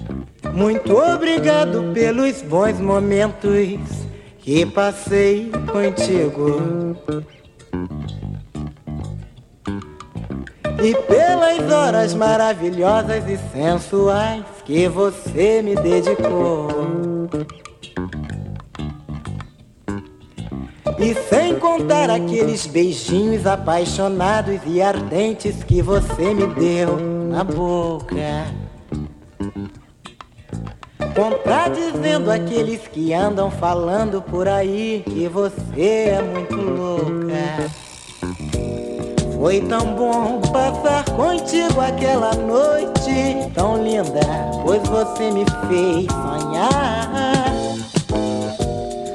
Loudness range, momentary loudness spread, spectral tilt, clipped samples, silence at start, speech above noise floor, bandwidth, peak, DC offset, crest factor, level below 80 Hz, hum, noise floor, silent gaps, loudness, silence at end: 8 LU; 14 LU; -6 dB/octave; under 0.1%; 0 s; 24 dB; 12 kHz; 0 dBFS; under 0.1%; 18 dB; -36 dBFS; none; -42 dBFS; none; -19 LUFS; 0 s